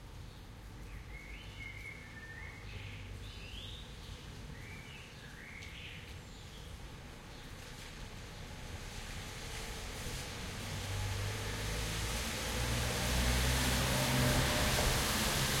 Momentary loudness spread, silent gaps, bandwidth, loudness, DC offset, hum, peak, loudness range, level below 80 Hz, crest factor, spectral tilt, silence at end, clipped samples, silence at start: 19 LU; none; 16.5 kHz; -37 LUFS; under 0.1%; none; -18 dBFS; 16 LU; -44 dBFS; 20 dB; -3.5 dB/octave; 0 s; under 0.1%; 0 s